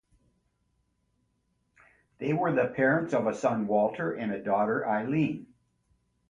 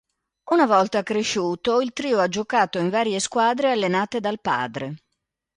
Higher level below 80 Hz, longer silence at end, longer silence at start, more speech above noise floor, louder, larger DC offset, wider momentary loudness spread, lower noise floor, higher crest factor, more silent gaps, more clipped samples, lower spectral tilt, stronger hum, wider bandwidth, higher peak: about the same, -68 dBFS vs -64 dBFS; first, 0.85 s vs 0.6 s; first, 2.2 s vs 0.45 s; second, 47 dB vs 57 dB; second, -28 LUFS vs -22 LUFS; neither; about the same, 7 LU vs 7 LU; second, -74 dBFS vs -79 dBFS; about the same, 18 dB vs 18 dB; neither; neither; first, -7.5 dB/octave vs -4 dB/octave; neither; about the same, 10 kHz vs 11 kHz; second, -12 dBFS vs -4 dBFS